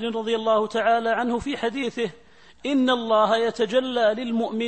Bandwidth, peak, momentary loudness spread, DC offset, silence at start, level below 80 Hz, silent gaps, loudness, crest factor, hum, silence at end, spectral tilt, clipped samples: 8.8 kHz; -8 dBFS; 7 LU; 0.2%; 0 s; -58 dBFS; none; -23 LUFS; 16 dB; none; 0 s; -4.5 dB/octave; under 0.1%